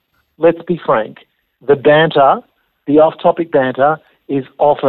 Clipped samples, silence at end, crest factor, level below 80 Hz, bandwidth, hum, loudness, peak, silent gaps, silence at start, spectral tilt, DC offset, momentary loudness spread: under 0.1%; 0 s; 12 dB; -56 dBFS; 4.3 kHz; none; -13 LUFS; 0 dBFS; none; 0.4 s; -10 dB/octave; under 0.1%; 12 LU